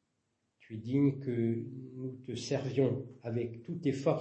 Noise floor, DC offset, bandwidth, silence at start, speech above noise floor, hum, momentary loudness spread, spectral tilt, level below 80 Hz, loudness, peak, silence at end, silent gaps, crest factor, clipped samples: -81 dBFS; under 0.1%; 8.6 kHz; 0.7 s; 47 dB; none; 13 LU; -7.5 dB/octave; -74 dBFS; -34 LUFS; -16 dBFS; 0 s; none; 18 dB; under 0.1%